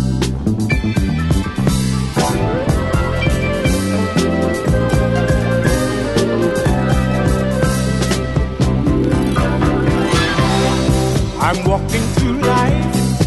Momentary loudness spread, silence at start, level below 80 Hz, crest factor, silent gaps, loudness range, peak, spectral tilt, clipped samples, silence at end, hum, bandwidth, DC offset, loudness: 3 LU; 0 s; -24 dBFS; 14 dB; none; 1 LU; -2 dBFS; -6 dB/octave; under 0.1%; 0 s; none; 12.5 kHz; under 0.1%; -16 LUFS